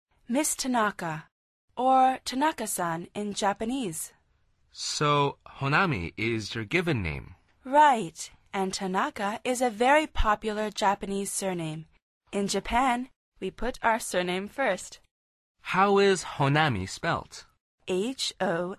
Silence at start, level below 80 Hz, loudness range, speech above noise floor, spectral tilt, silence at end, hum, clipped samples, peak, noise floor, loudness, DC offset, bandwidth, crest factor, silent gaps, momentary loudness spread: 0.3 s; -46 dBFS; 4 LU; 41 dB; -4 dB/octave; 0.05 s; none; under 0.1%; -8 dBFS; -68 dBFS; -27 LUFS; under 0.1%; 13.5 kHz; 20 dB; 1.32-1.68 s, 12.02-12.21 s, 13.16-13.32 s, 15.11-15.55 s, 17.61-17.78 s; 14 LU